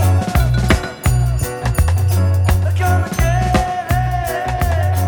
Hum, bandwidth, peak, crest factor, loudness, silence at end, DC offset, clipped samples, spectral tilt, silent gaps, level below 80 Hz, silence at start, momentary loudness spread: none; over 20 kHz; 0 dBFS; 14 dB; -17 LUFS; 0 s; under 0.1%; under 0.1%; -6 dB/octave; none; -22 dBFS; 0 s; 4 LU